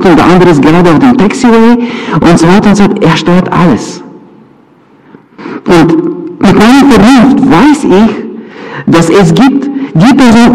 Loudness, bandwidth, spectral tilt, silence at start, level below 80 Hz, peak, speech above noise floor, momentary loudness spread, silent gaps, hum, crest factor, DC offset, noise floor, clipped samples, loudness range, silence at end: -5 LUFS; 13.5 kHz; -6.5 dB/octave; 0 s; -30 dBFS; 0 dBFS; 37 dB; 13 LU; none; none; 4 dB; under 0.1%; -40 dBFS; 5%; 5 LU; 0 s